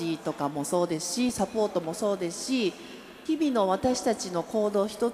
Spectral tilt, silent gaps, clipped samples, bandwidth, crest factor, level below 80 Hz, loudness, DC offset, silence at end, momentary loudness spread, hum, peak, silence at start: -4.5 dB/octave; none; under 0.1%; 15.5 kHz; 16 dB; -60 dBFS; -28 LUFS; under 0.1%; 0 s; 6 LU; none; -12 dBFS; 0 s